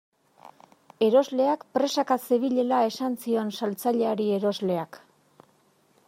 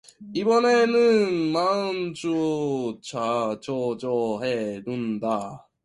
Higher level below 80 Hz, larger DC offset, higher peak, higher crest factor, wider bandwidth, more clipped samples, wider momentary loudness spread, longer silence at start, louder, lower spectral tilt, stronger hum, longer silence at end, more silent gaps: second, -80 dBFS vs -66 dBFS; neither; about the same, -8 dBFS vs -10 dBFS; about the same, 18 dB vs 14 dB; first, 16 kHz vs 11 kHz; neither; second, 7 LU vs 11 LU; first, 0.45 s vs 0.2 s; about the same, -25 LUFS vs -24 LUFS; about the same, -5.5 dB/octave vs -5.5 dB/octave; neither; first, 1.1 s vs 0.25 s; neither